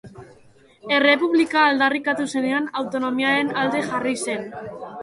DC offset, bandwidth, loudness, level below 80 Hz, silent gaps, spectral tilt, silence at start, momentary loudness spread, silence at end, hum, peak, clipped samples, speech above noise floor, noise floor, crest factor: under 0.1%; 11.5 kHz; -20 LUFS; -64 dBFS; none; -3.5 dB/octave; 0.05 s; 12 LU; 0 s; none; -4 dBFS; under 0.1%; 31 dB; -52 dBFS; 18 dB